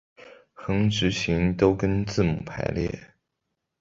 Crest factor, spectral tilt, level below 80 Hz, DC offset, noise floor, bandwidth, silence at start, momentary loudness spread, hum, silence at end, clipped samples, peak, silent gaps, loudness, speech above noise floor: 20 dB; -6 dB/octave; -42 dBFS; under 0.1%; -81 dBFS; 7.8 kHz; 0.2 s; 9 LU; none; 0.75 s; under 0.1%; -6 dBFS; none; -25 LUFS; 57 dB